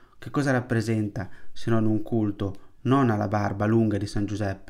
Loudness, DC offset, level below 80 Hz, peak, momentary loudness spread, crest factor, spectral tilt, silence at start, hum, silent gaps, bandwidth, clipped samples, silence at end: -26 LUFS; under 0.1%; -48 dBFS; -10 dBFS; 11 LU; 16 dB; -7.5 dB/octave; 0.15 s; none; none; 11.5 kHz; under 0.1%; 0 s